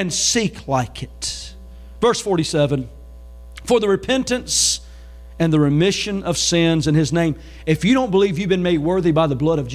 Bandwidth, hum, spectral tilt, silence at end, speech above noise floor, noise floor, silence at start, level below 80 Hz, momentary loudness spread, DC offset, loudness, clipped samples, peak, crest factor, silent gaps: 15.5 kHz; none; -4.5 dB/octave; 0 s; 20 dB; -38 dBFS; 0 s; -40 dBFS; 10 LU; under 0.1%; -18 LUFS; under 0.1%; -4 dBFS; 14 dB; none